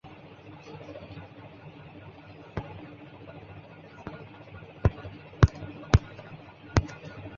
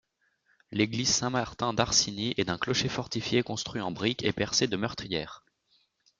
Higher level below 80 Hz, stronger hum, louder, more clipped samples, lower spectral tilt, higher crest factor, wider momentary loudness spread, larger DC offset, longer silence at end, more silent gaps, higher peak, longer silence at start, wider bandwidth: first, -38 dBFS vs -56 dBFS; neither; about the same, -29 LUFS vs -28 LUFS; neither; first, -6.5 dB/octave vs -3 dB/octave; first, 30 dB vs 22 dB; first, 22 LU vs 9 LU; neither; second, 0 s vs 0.8 s; neither; first, -2 dBFS vs -8 dBFS; second, 0.05 s vs 0.7 s; second, 7.2 kHz vs 11 kHz